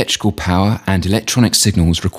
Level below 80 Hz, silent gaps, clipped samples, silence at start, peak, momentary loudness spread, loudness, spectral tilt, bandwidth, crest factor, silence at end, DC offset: -32 dBFS; none; under 0.1%; 0 s; 0 dBFS; 5 LU; -14 LUFS; -4.5 dB/octave; 16 kHz; 14 dB; 0 s; under 0.1%